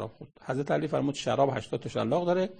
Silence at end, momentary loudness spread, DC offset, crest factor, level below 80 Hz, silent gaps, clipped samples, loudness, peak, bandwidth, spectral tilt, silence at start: 0.05 s; 8 LU; under 0.1%; 18 dB; -62 dBFS; none; under 0.1%; -29 LUFS; -12 dBFS; 9.6 kHz; -6 dB/octave; 0 s